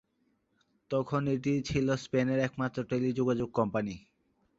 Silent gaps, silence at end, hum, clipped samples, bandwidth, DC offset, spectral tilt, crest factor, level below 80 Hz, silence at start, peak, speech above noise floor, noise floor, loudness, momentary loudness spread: none; 0.6 s; none; under 0.1%; 7.8 kHz; under 0.1%; -7 dB/octave; 18 dB; -58 dBFS; 0.9 s; -12 dBFS; 44 dB; -75 dBFS; -31 LUFS; 5 LU